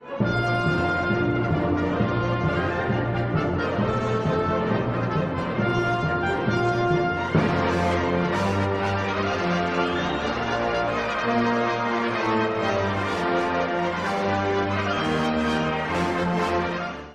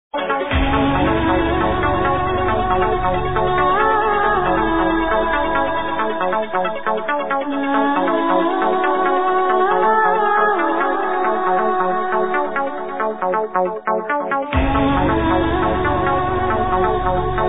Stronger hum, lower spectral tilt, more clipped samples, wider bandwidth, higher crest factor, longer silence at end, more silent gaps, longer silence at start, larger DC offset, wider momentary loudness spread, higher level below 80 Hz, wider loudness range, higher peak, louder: neither; second, -6.5 dB/octave vs -10 dB/octave; neither; first, 11 kHz vs 4 kHz; about the same, 16 dB vs 14 dB; about the same, 0 s vs 0 s; neither; about the same, 0 s vs 0.1 s; second, under 0.1% vs 2%; second, 2 LU vs 5 LU; second, -44 dBFS vs -32 dBFS; about the same, 1 LU vs 3 LU; second, -8 dBFS vs -4 dBFS; second, -24 LUFS vs -18 LUFS